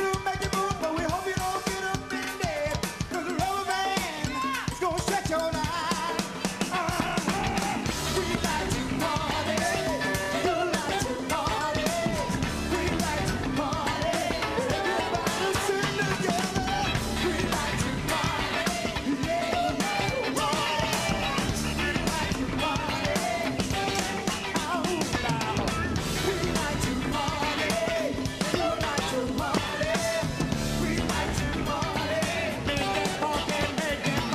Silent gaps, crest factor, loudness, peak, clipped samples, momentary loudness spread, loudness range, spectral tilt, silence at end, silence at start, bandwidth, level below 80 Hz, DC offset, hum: none; 18 dB; -28 LUFS; -10 dBFS; under 0.1%; 3 LU; 2 LU; -4 dB/octave; 0 s; 0 s; 15 kHz; -42 dBFS; under 0.1%; none